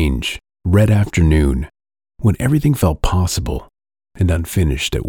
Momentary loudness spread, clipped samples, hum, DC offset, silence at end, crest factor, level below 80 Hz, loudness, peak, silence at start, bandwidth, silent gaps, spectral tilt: 10 LU; under 0.1%; none; under 0.1%; 0 s; 14 dB; -24 dBFS; -17 LUFS; -2 dBFS; 0 s; 18.5 kHz; none; -6 dB/octave